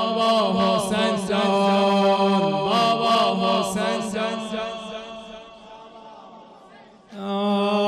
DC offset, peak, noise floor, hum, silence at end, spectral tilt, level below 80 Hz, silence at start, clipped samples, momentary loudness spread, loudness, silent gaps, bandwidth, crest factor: under 0.1%; -10 dBFS; -48 dBFS; none; 0 s; -5 dB/octave; -60 dBFS; 0 s; under 0.1%; 16 LU; -21 LUFS; none; 13.5 kHz; 12 dB